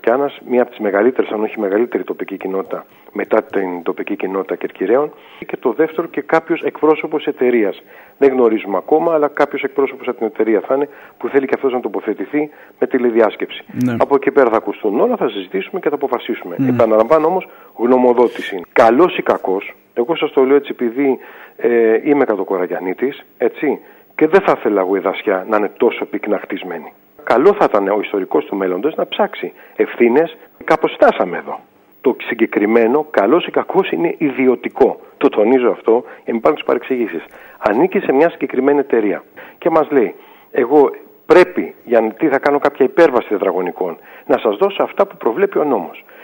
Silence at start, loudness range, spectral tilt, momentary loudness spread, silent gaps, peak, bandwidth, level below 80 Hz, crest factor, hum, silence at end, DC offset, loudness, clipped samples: 0.05 s; 4 LU; -7 dB/octave; 10 LU; none; 0 dBFS; 16.5 kHz; -60 dBFS; 16 dB; none; 0.25 s; under 0.1%; -16 LUFS; under 0.1%